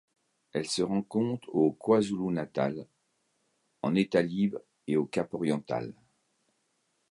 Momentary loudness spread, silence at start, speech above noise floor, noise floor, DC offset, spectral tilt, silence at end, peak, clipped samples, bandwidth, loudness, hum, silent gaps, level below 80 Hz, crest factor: 10 LU; 0.55 s; 47 dB; -76 dBFS; under 0.1%; -6 dB/octave; 1.2 s; -12 dBFS; under 0.1%; 11.5 kHz; -30 LUFS; none; none; -68 dBFS; 20 dB